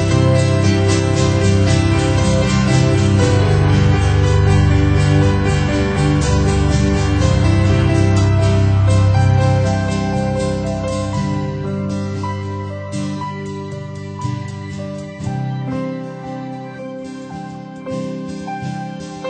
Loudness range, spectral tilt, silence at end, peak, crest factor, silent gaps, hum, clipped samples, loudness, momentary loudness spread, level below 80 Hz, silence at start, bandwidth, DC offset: 12 LU; -6.5 dB/octave; 0 s; -2 dBFS; 12 dB; none; none; under 0.1%; -16 LUFS; 14 LU; -26 dBFS; 0 s; 9.2 kHz; under 0.1%